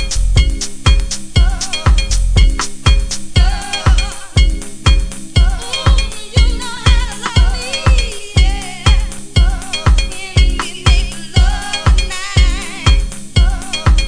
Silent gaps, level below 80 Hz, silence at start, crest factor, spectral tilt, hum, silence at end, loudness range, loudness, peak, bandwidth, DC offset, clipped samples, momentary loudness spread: none; -14 dBFS; 0 s; 12 dB; -4 dB/octave; none; 0 s; 0 LU; -15 LUFS; 0 dBFS; 10.5 kHz; under 0.1%; 0.1%; 3 LU